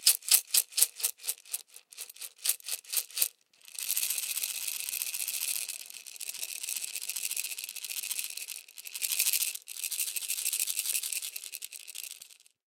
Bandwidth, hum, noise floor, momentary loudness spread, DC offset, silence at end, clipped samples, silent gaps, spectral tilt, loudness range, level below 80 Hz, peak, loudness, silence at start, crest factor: 17 kHz; none; -55 dBFS; 15 LU; under 0.1%; 0.35 s; under 0.1%; none; 6 dB/octave; 4 LU; under -90 dBFS; -2 dBFS; -31 LUFS; 0 s; 32 dB